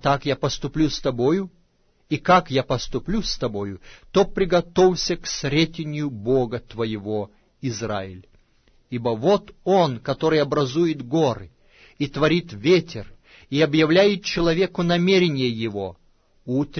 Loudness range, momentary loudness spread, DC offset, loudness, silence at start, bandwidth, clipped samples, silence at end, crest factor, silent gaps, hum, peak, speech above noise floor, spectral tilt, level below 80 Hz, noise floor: 5 LU; 12 LU; under 0.1%; -22 LUFS; 0 s; 6.6 kHz; under 0.1%; 0 s; 16 dB; none; none; -6 dBFS; 40 dB; -5.5 dB/octave; -42 dBFS; -62 dBFS